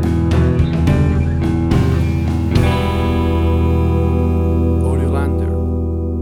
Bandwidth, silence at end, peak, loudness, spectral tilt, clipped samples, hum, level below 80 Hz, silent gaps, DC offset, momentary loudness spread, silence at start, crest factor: 11 kHz; 0 s; 0 dBFS; -16 LUFS; -8.5 dB/octave; under 0.1%; none; -22 dBFS; none; under 0.1%; 3 LU; 0 s; 14 dB